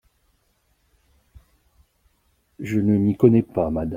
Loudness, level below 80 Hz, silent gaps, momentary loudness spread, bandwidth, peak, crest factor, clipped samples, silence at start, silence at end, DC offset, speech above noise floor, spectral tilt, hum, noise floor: -20 LUFS; -50 dBFS; none; 9 LU; 15.5 kHz; -2 dBFS; 22 dB; under 0.1%; 2.6 s; 0 s; under 0.1%; 47 dB; -10 dB/octave; none; -66 dBFS